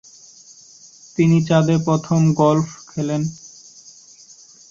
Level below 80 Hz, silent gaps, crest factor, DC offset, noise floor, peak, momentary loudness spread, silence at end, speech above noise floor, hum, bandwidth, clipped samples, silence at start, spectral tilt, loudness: -56 dBFS; none; 16 dB; under 0.1%; -46 dBFS; -4 dBFS; 14 LU; 1.25 s; 29 dB; none; 7.6 kHz; under 0.1%; 1.2 s; -7 dB/octave; -18 LUFS